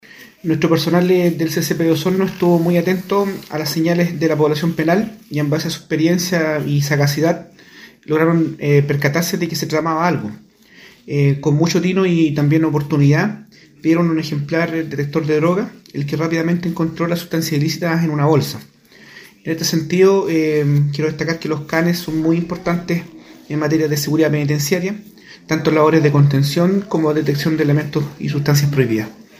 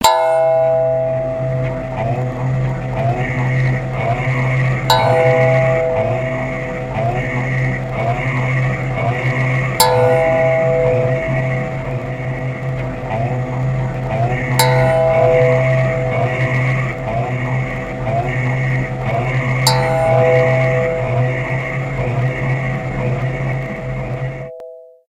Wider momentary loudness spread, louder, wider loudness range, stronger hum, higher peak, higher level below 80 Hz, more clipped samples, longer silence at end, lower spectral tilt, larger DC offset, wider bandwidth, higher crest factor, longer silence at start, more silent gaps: about the same, 8 LU vs 9 LU; about the same, -17 LUFS vs -17 LUFS; about the same, 3 LU vs 4 LU; neither; about the same, 0 dBFS vs 0 dBFS; second, -54 dBFS vs -36 dBFS; neither; about the same, 0.15 s vs 0.2 s; about the same, -6 dB/octave vs -6 dB/octave; neither; about the same, 16 kHz vs 16 kHz; about the same, 16 dB vs 16 dB; first, 0.2 s vs 0 s; neither